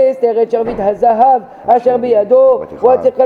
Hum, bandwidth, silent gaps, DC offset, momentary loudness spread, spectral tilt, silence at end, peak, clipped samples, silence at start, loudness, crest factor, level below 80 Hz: none; 5 kHz; none; under 0.1%; 6 LU; -8 dB/octave; 0 s; 0 dBFS; under 0.1%; 0 s; -12 LUFS; 10 dB; -46 dBFS